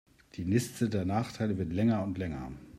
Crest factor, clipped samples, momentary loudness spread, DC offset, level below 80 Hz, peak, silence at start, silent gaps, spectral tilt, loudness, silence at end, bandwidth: 18 dB; under 0.1%; 10 LU; under 0.1%; -56 dBFS; -14 dBFS; 0.35 s; none; -7 dB/octave; -32 LUFS; 0 s; 15 kHz